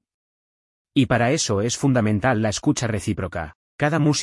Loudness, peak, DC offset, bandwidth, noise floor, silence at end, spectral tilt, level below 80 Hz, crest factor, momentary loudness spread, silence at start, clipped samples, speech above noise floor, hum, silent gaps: -21 LUFS; -6 dBFS; under 0.1%; 12 kHz; under -90 dBFS; 0 s; -5 dB/octave; -50 dBFS; 16 dB; 8 LU; 0.95 s; under 0.1%; over 70 dB; none; 3.55-3.79 s